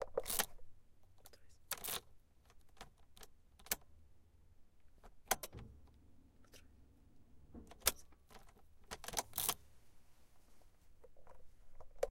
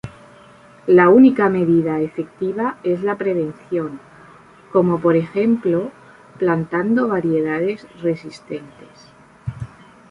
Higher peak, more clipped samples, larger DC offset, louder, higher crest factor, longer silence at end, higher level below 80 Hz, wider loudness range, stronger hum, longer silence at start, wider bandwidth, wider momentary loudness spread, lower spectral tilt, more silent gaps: second, -14 dBFS vs -2 dBFS; neither; neither; second, -42 LUFS vs -18 LUFS; first, 34 dB vs 18 dB; second, 0 s vs 0.45 s; second, -62 dBFS vs -54 dBFS; about the same, 6 LU vs 6 LU; neither; about the same, 0 s vs 0.05 s; first, 17 kHz vs 10 kHz; first, 26 LU vs 19 LU; second, -1 dB/octave vs -9 dB/octave; neither